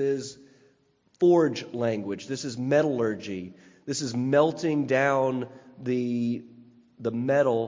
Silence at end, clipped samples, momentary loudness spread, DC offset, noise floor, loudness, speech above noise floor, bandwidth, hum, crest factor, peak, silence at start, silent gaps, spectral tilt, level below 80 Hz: 0 s; under 0.1%; 13 LU; under 0.1%; -66 dBFS; -26 LUFS; 40 dB; 7.6 kHz; none; 18 dB; -8 dBFS; 0 s; none; -6 dB/octave; -68 dBFS